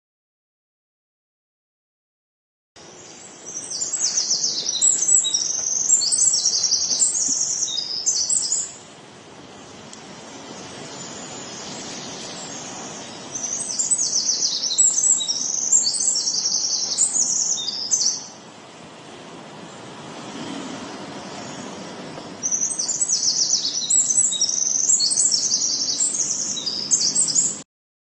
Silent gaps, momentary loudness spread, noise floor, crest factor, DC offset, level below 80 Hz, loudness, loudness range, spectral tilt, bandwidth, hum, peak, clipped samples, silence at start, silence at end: none; 21 LU; -43 dBFS; 20 dB; under 0.1%; -70 dBFS; -18 LUFS; 17 LU; 0.5 dB/octave; 11 kHz; none; -4 dBFS; under 0.1%; 2.75 s; 0.5 s